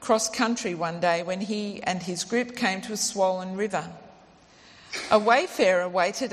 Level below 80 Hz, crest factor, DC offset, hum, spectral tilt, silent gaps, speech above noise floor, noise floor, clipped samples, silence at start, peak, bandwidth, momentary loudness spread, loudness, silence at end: -66 dBFS; 20 dB; under 0.1%; none; -3.5 dB/octave; none; 28 dB; -54 dBFS; under 0.1%; 0 s; -6 dBFS; 14 kHz; 8 LU; -25 LUFS; 0 s